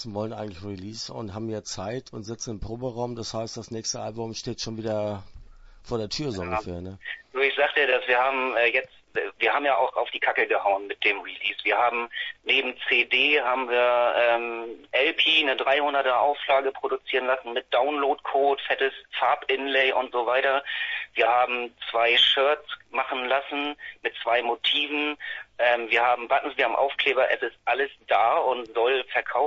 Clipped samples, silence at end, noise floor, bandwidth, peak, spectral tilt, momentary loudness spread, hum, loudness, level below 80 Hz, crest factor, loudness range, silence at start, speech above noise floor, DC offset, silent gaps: under 0.1%; 0 s; -46 dBFS; 8 kHz; -8 dBFS; -3 dB/octave; 13 LU; none; -24 LUFS; -56 dBFS; 18 dB; 10 LU; 0 s; 21 dB; under 0.1%; none